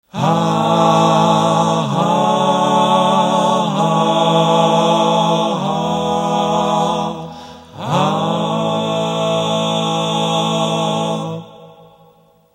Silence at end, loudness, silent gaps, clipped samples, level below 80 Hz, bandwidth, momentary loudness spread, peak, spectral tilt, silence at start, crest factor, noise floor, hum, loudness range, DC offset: 0.85 s; -15 LUFS; none; under 0.1%; -56 dBFS; 13 kHz; 7 LU; 0 dBFS; -5.5 dB/octave; 0.15 s; 16 dB; -50 dBFS; none; 4 LU; under 0.1%